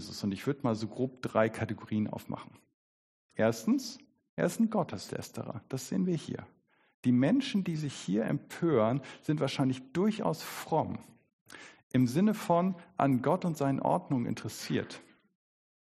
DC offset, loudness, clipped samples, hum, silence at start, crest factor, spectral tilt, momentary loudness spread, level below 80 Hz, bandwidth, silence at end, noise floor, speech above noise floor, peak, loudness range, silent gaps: under 0.1%; -32 LUFS; under 0.1%; none; 0 s; 20 dB; -6.5 dB/octave; 14 LU; -70 dBFS; 13.5 kHz; 0.85 s; under -90 dBFS; over 59 dB; -12 dBFS; 4 LU; 2.74-3.29 s, 4.29-4.37 s, 6.94-7.03 s, 11.33-11.46 s, 11.83-11.90 s